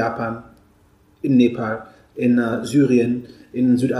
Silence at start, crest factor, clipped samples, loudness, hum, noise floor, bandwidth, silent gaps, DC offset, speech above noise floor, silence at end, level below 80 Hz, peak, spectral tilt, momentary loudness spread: 0 s; 14 dB; under 0.1%; -19 LUFS; none; -55 dBFS; 12 kHz; none; under 0.1%; 37 dB; 0 s; -58 dBFS; -4 dBFS; -7.5 dB/octave; 14 LU